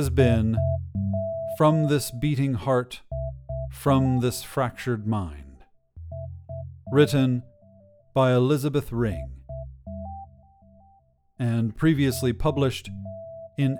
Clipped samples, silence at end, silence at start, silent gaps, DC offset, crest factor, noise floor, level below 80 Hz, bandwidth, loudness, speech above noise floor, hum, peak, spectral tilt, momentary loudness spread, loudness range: under 0.1%; 0 s; 0 s; none; under 0.1%; 20 dB; -61 dBFS; -42 dBFS; 18.5 kHz; -25 LUFS; 38 dB; none; -6 dBFS; -7 dB/octave; 18 LU; 4 LU